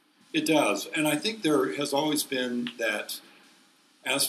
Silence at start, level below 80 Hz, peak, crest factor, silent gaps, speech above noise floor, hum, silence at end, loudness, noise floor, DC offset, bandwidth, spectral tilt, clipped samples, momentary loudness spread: 0.35 s; -80 dBFS; -10 dBFS; 18 dB; none; 34 dB; none; 0 s; -27 LUFS; -61 dBFS; under 0.1%; 16 kHz; -3 dB/octave; under 0.1%; 8 LU